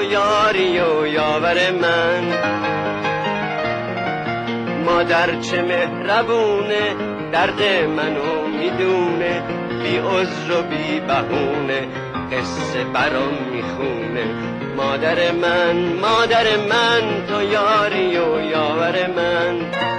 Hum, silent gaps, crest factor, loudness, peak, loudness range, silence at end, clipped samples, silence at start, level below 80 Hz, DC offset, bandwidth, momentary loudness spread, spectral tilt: none; none; 14 dB; -19 LUFS; -6 dBFS; 4 LU; 0 s; under 0.1%; 0 s; -50 dBFS; under 0.1%; 10.5 kHz; 7 LU; -5 dB/octave